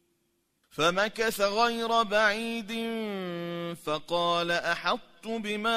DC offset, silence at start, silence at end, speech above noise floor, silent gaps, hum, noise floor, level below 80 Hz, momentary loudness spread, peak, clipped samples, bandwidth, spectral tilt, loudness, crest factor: under 0.1%; 0.75 s; 0 s; 46 dB; none; none; -74 dBFS; -64 dBFS; 10 LU; -12 dBFS; under 0.1%; 15.5 kHz; -3.5 dB/octave; -28 LUFS; 18 dB